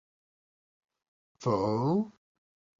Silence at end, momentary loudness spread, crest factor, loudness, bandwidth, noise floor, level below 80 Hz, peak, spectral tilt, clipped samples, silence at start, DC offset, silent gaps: 0.7 s; 8 LU; 18 dB; -30 LUFS; 7.6 kHz; under -90 dBFS; -66 dBFS; -16 dBFS; -8 dB/octave; under 0.1%; 1.4 s; under 0.1%; none